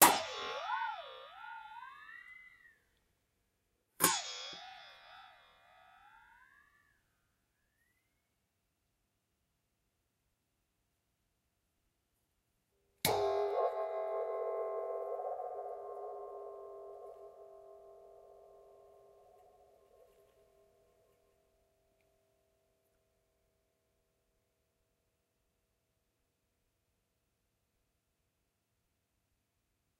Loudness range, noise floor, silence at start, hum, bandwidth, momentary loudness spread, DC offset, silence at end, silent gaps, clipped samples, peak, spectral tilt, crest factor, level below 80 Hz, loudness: 20 LU; -83 dBFS; 0 s; none; 15.5 kHz; 24 LU; under 0.1%; 11.2 s; none; under 0.1%; -8 dBFS; -1.5 dB/octave; 36 dB; -78 dBFS; -37 LUFS